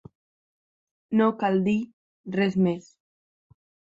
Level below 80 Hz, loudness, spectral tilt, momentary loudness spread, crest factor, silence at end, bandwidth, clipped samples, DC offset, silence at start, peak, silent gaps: -66 dBFS; -25 LUFS; -8 dB/octave; 14 LU; 18 dB; 1.15 s; 7.6 kHz; under 0.1%; under 0.1%; 1.1 s; -10 dBFS; 1.93-2.24 s